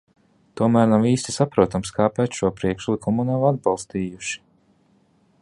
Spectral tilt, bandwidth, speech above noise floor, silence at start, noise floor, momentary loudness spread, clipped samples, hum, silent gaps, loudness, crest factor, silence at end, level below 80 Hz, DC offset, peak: -6 dB/octave; 11.5 kHz; 40 dB; 0.55 s; -60 dBFS; 11 LU; under 0.1%; none; none; -21 LUFS; 20 dB; 1.05 s; -50 dBFS; under 0.1%; -2 dBFS